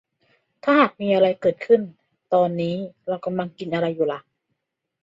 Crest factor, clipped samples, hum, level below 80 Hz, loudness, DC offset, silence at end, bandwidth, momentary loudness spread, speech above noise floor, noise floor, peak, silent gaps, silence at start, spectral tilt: 18 dB; under 0.1%; none; -68 dBFS; -22 LUFS; under 0.1%; 0.85 s; 7.6 kHz; 11 LU; 57 dB; -78 dBFS; -4 dBFS; none; 0.65 s; -8 dB/octave